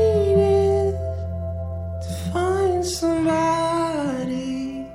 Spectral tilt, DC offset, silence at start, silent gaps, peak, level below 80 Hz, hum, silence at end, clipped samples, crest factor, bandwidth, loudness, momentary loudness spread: -6.5 dB/octave; under 0.1%; 0 s; none; -6 dBFS; -38 dBFS; none; 0 s; under 0.1%; 16 dB; 15.5 kHz; -22 LUFS; 11 LU